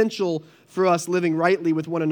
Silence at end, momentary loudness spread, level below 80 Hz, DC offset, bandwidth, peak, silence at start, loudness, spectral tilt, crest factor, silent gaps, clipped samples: 0 s; 8 LU; -82 dBFS; under 0.1%; 19.5 kHz; -4 dBFS; 0 s; -22 LUFS; -6 dB/octave; 18 dB; none; under 0.1%